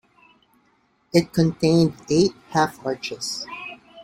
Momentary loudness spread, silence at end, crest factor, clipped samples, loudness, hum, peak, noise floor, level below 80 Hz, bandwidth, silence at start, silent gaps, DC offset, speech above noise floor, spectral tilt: 12 LU; 0 s; 20 dB; under 0.1%; -22 LUFS; none; -4 dBFS; -64 dBFS; -56 dBFS; 15.5 kHz; 1.15 s; none; under 0.1%; 43 dB; -5.5 dB/octave